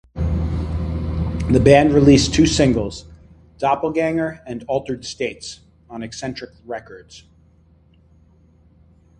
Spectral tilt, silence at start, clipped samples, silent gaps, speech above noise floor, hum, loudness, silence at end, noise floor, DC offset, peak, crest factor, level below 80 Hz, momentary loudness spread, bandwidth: -6 dB/octave; 0.15 s; under 0.1%; none; 35 dB; none; -18 LUFS; 2 s; -53 dBFS; under 0.1%; 0 dBFS; 20 dB; -32 dBFS; 21 LU; 11 kHz